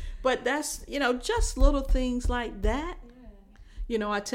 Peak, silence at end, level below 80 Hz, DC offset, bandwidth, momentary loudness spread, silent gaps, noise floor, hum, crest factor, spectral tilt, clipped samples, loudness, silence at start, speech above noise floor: -6 dBFS; 0 s; -30 dBFS; under 0.1%; 15.5 kHz; 8 LU; none; -50 dBFS; none; 20 dB; -4.5 dB/octave; under 0.1%; -29 LUFS; 0 s; 23 dB